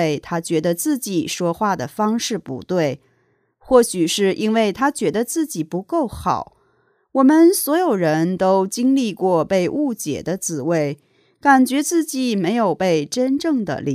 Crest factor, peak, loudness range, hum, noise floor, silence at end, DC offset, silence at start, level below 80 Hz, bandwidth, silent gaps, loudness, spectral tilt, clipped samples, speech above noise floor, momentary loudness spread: 18 dB; 0 dBFS; 4 LU; none; -63 dBFS; 0 s; under 0.1%; 0 s; -54 dBFS; 15.5 kHz; none; -19 LUFS; -5 dB/octave; under 0.1%; 45 dB; 9 LU